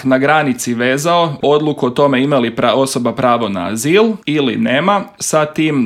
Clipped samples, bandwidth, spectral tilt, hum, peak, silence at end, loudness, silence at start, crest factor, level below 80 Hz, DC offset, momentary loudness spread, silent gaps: under 0.1%; 15.5 kHz; -4.5 dB/octave; none; 0 dBFS; 0 s; -14 LUFS; 0 s; 14 dB; -56 dBFS; under 0.1%; 4 LU; none